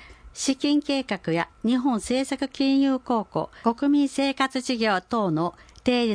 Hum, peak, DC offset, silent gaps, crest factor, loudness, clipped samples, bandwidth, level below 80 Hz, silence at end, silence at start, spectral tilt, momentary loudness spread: none; -8 dBFS; under 0.1%; none; 16 dB; -24 LUFS; under 0.1%; 10.5 kHz; -56 dBFS; 0 s; 0 s; -4.5 dB/octave; 6 LU